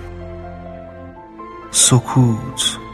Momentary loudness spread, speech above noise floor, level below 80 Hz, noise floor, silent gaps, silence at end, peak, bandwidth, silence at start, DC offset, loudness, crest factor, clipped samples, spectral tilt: 24 LU; 20 dB; -42 dBFS; -36 dBFS; none; 0 s; 0 dBFS; 15 kHz; 0 s; under 0.1%; -15 LUFS; 18 dB; under 0.1%; -3.5 dB/octave